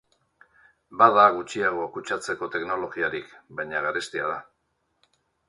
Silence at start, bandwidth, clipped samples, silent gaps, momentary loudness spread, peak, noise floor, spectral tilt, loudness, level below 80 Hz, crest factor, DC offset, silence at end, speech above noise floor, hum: 0.9 s; 11.5 kHz; under 0.1%; none; 17 LU; -2 dBFS; -74 dBFS; -4 dB/octave; -24 LUFS; -66 dBFS; 24 dB; under 0.1%; 1.05 s; 49 dB; none